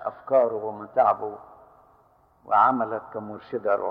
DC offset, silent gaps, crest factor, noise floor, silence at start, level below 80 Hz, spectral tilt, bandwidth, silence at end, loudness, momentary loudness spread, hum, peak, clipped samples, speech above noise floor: under 0.1%; none; 18 dB; -60 dBFS; 0 s; -68 dBFS; -8.5 dB/octave; 5.2 kHz; 0 s; -24 LUFS; 16 LU; none; -6 dBFS; under 0.1%; 36 dB